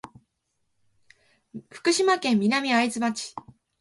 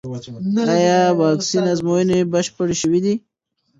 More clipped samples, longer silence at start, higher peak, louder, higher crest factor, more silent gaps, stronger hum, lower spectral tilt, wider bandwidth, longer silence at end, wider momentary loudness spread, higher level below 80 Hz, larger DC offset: neither; first, 1.55 s vs 0.05 s; second, -8 dBFS vs -2 dBFS; second, -23 LUFS vs -18 LUFS; about the same, 18 dB vs 16 dB; neither; neither; second, -3.5 dB/octave vs -5.5 dB/octave; first, 11.5 kHz vs 8 kHz; second, 0.4 s vs 0.6 s; first, 22 LU vs 7 LU; second, -70 dBFS vs -56 dBFS; neither